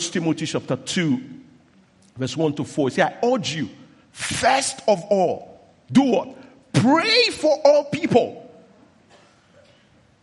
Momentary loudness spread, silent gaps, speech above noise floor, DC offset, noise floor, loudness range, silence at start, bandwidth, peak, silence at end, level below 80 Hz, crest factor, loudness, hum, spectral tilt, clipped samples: 13 LU; none; 36 dB; under 0.1%; -56 dBFS; 5 LU; 0 s; 11.5 kHz; -2 dBFS; 1.75 s; -60 dBFS; 20 dB; -20 LUFS; none; -4.5 dB/octave; under 0.1%